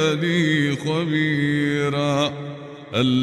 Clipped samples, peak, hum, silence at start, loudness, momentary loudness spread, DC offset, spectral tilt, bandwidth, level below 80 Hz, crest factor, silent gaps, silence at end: under 0.1%; -6 dBFS; none; 0 s; -21 LUFS; 9 LU; under 0.1%; -6 dB/octave; 12 kHz; -58 dBFS; 14 dB; none; 0 s